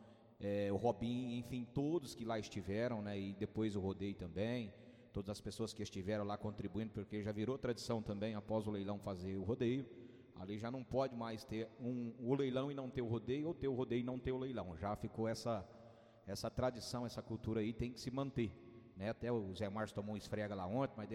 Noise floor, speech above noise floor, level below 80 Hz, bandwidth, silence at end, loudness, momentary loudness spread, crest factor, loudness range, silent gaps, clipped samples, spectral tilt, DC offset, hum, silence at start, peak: -62 dBFS; 20 dB; -64 dBFS; 15.5 kHz; 0 s; -43 LUFS; 7 LU; 18 dB; 2 LU; none; under 0.1%; -6.5 dB/octave; under 0.1%; none; 0 s; -24 dBFS